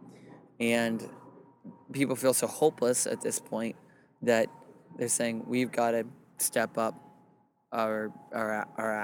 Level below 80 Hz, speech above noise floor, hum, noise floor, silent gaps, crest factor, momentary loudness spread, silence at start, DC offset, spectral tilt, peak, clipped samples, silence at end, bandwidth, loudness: -78 dBFS; 35 dB; none; -65 dBFS; none; 20 dB; 10 LU; 0 s; under 0.1%; -3.5 dB/octave; -12 dBFS; under 0.1%; 0 s; 19 kHz; -30 LUFS